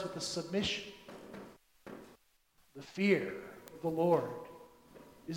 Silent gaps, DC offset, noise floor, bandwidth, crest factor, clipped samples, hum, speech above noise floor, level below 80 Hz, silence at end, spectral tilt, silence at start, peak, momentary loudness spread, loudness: none; under 0.1%; -70 dBFS; 16 kHz; 22 dB; under 0.1%; none; 36 dB; -68 dBFS; 0 s; -5 dB/octave; 0 s; -16 dBFS; 22 LU; -34 LUFS